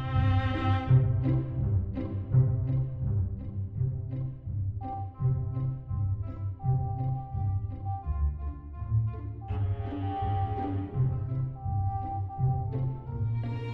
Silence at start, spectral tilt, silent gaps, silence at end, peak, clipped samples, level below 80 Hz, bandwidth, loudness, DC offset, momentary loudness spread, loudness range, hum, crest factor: 0 s; -10.5 dB/octave; none; 0 s; -12 dBFS; under 0.1%; -40 dBFS; 4.3 kHz; -31 LUFS; under 0.1%; 9 LU; 5 LU; none; 18 dB